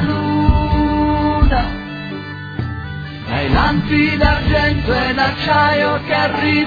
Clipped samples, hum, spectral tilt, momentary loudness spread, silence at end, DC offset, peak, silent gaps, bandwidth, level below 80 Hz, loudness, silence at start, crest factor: under 0.1%; none; -8 dB/octave; 12 LU; 0 s; under 0.1%; 0 dBFS; none; 5 kHz; -22 dBFS; -16 LUFS; 0 s; 16 dB